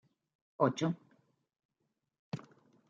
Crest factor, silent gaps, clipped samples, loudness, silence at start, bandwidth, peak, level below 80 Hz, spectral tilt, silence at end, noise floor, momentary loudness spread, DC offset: 26 dB; 1.65-1.69 s, 2.19-2.32 s; under 0.1%; -36 LUFS; 0.6 s; 7.6 kHz; -14 dBFS; -84 dBFS; -6.5 dB/octave; 0.5 s; -84 dBFS; 15 LU; under 0.1%